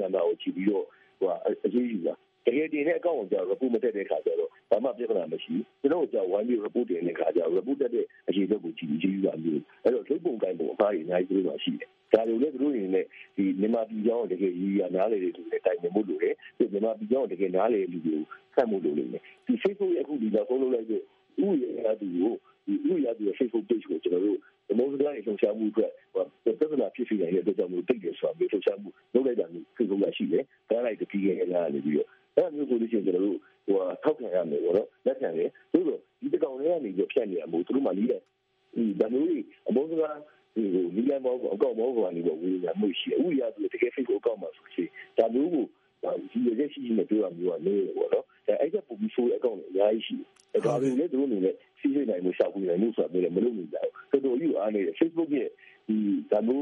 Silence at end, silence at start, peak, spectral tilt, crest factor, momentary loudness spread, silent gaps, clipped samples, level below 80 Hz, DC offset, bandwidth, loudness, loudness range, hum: 0 s; 0 s; -4 dBFS; -6 dB/octave; 24 dB; 5 LU; none; under 0.1%; -80 dBFS; under 0.1%; 6.8 kHz; -29 LUFS; 1 LU; none